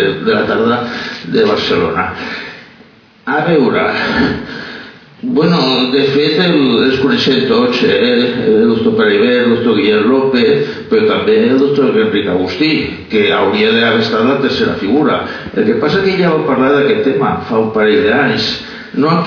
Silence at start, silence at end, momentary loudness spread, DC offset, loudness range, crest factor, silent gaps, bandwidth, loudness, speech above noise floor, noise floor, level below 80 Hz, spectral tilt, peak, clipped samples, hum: 0 s; 0 s; 7 LU; under 0.1%; 4 LU; 10 dB; none; 5.4 kHz; -12 LUFS; 31 dB; -42 dBFS; -46 dBFS; -6.5 dB/octave; -2 dBFS; under 0.1%; none